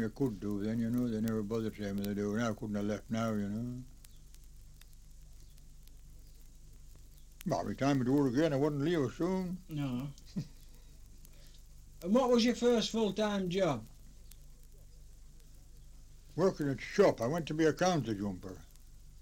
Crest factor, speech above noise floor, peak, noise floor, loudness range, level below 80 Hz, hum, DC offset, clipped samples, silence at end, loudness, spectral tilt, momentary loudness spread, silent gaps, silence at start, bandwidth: 20 dB; 21 dB; -14 dBFS; -54 dBFS; 8 LU; -54 dBFS; none; under 0.1%; under 0.1%; 0 s; -33 LUFS; -6 dB/octave; 14 LU; none; 0 s; 16.5 kHz